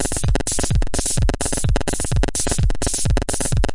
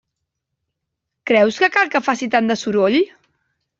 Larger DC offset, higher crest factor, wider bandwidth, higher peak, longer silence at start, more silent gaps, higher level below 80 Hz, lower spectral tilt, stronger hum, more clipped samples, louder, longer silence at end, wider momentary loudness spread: first, 1% vs under 0.1%; about the same, 14 dB vs 18 dB; first, 11.5 kHz vs 7.8 kHz; about the same, -4 dBFS vs -2 dBFS; second, 0 s vs 1.25 s; neither; first, -22 dBFS vs -64 dBFS; about the same, -4 dB/octave vs -4.5 dB/octave; neither; neither; second, -21 LUFS vs -17 LUFS; second, 0 s vs 0.7 s; second, 1 LU vs 5 LU